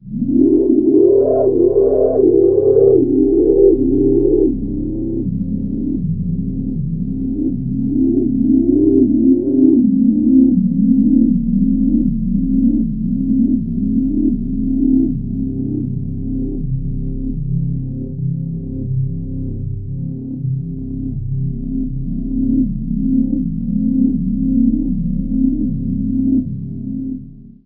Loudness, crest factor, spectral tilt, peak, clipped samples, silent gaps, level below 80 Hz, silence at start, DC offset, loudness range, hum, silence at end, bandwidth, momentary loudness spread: -16 LUFS; 14 dB; -16 dB/octave; 0 dBFS; under 0.1%; none; -28 dBFS; 0 s; under 0.1%; 10 LU; none; 0.15 s; 1.2 kHz; 12 LU